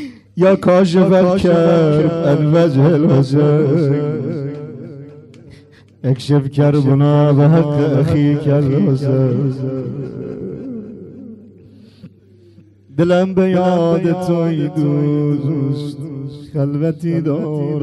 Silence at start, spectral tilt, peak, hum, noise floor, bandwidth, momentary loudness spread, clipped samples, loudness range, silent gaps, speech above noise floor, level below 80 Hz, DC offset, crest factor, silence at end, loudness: 0 s; -9 dB/octave; -2 dBFS; none; -46 dBFS; 10.5 kHz; 15 LU; under 0.1%; 9 LU; none; 32 dB; -50 dBFS; under 0.1%; 12 dB; 0 s; -14 LUFS